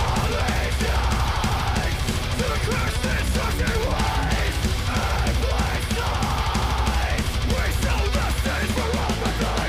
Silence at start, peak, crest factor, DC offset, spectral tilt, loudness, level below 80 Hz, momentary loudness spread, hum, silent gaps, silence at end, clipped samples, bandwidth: 0 s; -12 dBFS; 10 dB; under 0.1%; -4.5 dB/octave; -23 LUFS; -26 dBFS; 1 LU; none; none; 0 s; under 0.1%; 16 kHz